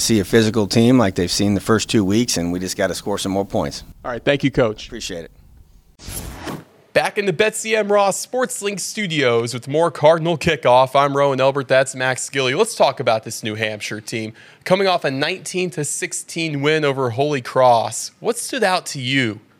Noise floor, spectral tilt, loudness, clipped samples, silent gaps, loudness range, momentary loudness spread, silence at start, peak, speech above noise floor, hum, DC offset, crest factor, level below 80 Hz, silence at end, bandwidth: -48 dBFS; -4.5 dB/octave; -18 LUFS; under 0.1%; none; 6 LU; 12 LU; 0 s; 0 dBFS; 29 dB; none; under 0.1%; 18 dB; -48 dBFS; 0.2 s; 18.5 kHz